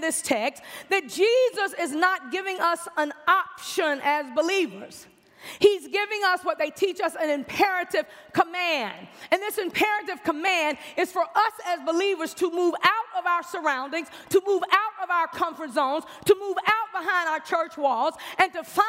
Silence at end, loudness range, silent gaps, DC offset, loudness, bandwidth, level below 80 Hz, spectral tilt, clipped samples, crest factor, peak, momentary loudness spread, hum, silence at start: 0 s; 1 LU; none; under 0.1%; -25 LUFS; 16 kHz; -72 dBFS; -2.5 dB/octave; under 0.1%; 22 dB; -4 dBFS; 7 LU; none; 0 s